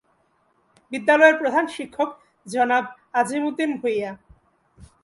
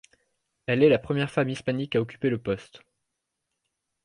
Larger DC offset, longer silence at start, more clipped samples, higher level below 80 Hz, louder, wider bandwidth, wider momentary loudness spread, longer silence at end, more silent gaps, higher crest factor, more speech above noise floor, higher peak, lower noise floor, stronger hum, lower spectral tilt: neither; first, 0.9 s vs 0.7 s; neither; about the same, -62 dBFS vs -60 dBFS; first, -21 LUFS vs -26 LUFS; about the same, 11.5 kHz vs 10.5 kHz; first, 14 LU vs 11 LU; second, 0.2 s vs 1.25 s; neither; about the same, 20 dB vs 20 dB; second, 44 dB vs 57 dB; first, -2 dBFS vs -8 dBFS; second, -65 dBFS vs -82 dBFS; neither; second, -4 dB/octave vs -7 dB/octave